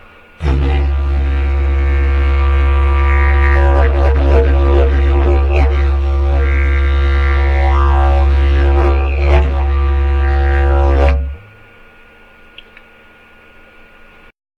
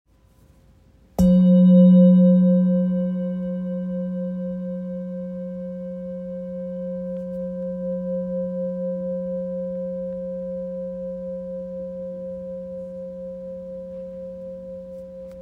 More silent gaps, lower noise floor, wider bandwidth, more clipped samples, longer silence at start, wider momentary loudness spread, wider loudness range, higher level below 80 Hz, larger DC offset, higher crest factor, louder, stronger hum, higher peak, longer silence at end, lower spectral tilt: neither; second, -42 dBFS vs -55 dBFS; first, 4.7 kHz vs 3.9 kHz; neither; second, 0.4 s vs 1.2 s; second, 4 LU vs 20 LU; second, 5 LU vs 16 LU; first, -12 dBFS vs -50 dBFS; neither; about the same, 12 dB vs 16 dB; first, -13 LUFS vs -22 LUFS; neither; first, 0 dBFS vs -6 dBFS; first, 3.2 s vs 0 s; second, -8.5 dB/octave vs -11 dB/octave